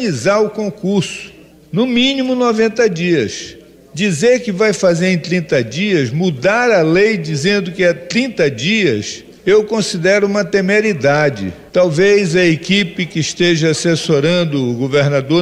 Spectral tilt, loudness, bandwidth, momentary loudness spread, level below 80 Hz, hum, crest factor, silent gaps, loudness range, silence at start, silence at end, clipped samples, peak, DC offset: -5 dB/octave; -14 LUFS; 12.5 kHz; 7 LU; -50 dBFS; none; 10 dB; none; 2 LU; 0 s; 0 s; under 0.1%; -4 dBFS; under 0.1%